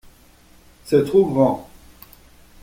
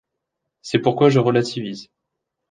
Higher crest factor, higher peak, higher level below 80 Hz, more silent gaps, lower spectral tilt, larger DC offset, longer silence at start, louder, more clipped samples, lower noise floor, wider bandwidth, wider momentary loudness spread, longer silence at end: about the same, 18 dB vs 18 dB; about the same, -4 dBFS vs -2 dBFS; first, -52 dBFS vs -62 dBFS; neither; first, -8 dB/octave vs -6.5 dB/octave; neither; first, 0.85 s vs 0.65 s; about the same, -18 LUFS vs -18 LUFS; neither; second, -50 dBFS vs -80 dBFS; first, 16.5 kHz vs 9.6 kHz; second, 5 LU vs 19 LU; first, 1 s vs 0.65 s